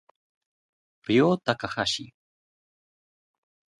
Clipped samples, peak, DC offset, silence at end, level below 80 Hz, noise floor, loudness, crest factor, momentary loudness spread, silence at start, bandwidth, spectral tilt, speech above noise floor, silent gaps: under 0.1%; -6 dBFS; under 0.1%; 1.75 s; -64 dBFS; under -90 dBFS; -25 LUFS; 24 dB; 10 LU; 1.1 s; 11.5 kHz; -5 dB/octave; over 66 dB; none